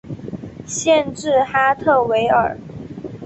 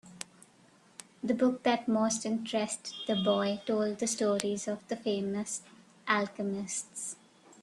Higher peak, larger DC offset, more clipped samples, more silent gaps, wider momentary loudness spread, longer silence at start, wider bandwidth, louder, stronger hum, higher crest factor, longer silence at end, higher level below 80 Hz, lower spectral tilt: first, -2 dBFS vs -10 dBFS; neither; neither; neither; about the same, 17 LU vs 16 LU; about the same, 0.05 s vs 0.05 s; second, 8.4 kHz vs 12.5 kHz; first, -17 LUFS vs -32 LUFS; neither; second, 16 dB vs 22 dB; about the same, 0 s vs 0.1 s; first, -50 dBFS vs -74 dBFS; about the same, -4 dB/octave vs -3.5 dB/octave